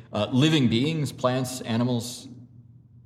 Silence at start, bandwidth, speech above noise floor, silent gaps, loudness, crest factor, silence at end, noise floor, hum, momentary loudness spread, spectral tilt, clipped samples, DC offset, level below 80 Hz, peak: 0.1 s; 15 kHz; 26 dB; none; -24 LUFS; 18 dB; 0.45 s; -50 dBFS; none; 14 LU; -5.5 dB/octave; under 0.1%; under 0.1%; -64 dBFS; -8 dBFS